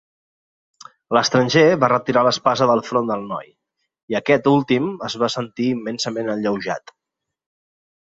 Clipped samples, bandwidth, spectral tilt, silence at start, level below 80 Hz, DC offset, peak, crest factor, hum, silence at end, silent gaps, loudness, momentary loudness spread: under 0.1%; 7.8 kHz; -5 dB/octave; 1.1 s; -62 dBFS; under 0.1%; -2 dBFS; 18 dB; none; 1.2 s; 4.03-4.08 s; -19 LUFS; 11 LU